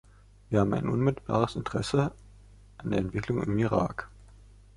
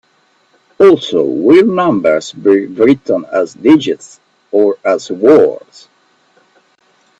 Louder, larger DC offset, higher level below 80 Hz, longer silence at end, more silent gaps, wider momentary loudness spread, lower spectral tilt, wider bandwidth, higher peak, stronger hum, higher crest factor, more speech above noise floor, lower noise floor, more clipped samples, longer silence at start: second, -29 LUFS vs -11 LUFS; neither; first, -50 dBFS vs -56 dBFS; second, 0.4 s vs 1.65 s; neither; about the same, 7 LU vs 8 LU; first, -7.5 dB/octave vs -6 dB/octave; first, 11.5 kHz vs 8 kHz; second, -8 dBFS vs 0 dBFS; first, 50 Hz at -50 dBFS vs none; first, 22 dB vs 12 dB; second, 25 dB vs 44 dB; about the same, -53 dBFS vs -55 dBFS; second, under 0.1% vs 0.1%; second, 0.5 s vs 0.8 s